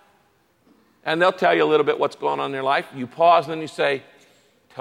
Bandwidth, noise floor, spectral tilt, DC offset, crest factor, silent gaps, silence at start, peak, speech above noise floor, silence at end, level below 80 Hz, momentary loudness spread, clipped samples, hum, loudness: 12 kHz; -62 dBFS; -5 dB/octave; under 0.1%; 18 dB; none; 1.05 s; -4 dBFS; 42 dB; 0 s; -74 dBFS; 13 LU; under 0.1%; none; -20 LUFS